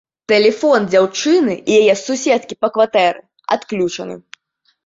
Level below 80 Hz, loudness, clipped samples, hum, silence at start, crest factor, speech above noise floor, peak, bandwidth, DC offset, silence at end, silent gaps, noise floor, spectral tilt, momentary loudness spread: -62 dBFS; -15 LUFS; under 0.1%; none; 0.3 s; 14 dB; 49 dB; -2 dBFS; 7.8 kHz; under 0.1%; 0.65 s; none; -64 dBFS; -4 dB/octave; 9 LU